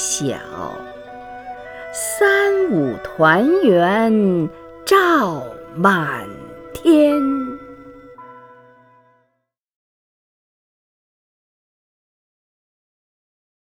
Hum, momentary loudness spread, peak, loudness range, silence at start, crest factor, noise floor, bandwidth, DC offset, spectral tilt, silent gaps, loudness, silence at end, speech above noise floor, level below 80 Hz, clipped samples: none; 20 LU; 0 dBFS; 5 LU; 0 s; 20 dB; -72 dBFS; 19.5 kHz; under 0.1%; -4.5 dB/octave; none; -16 LUFS; 5.25 s; 56 dB; -56 dBFS; under 0.1%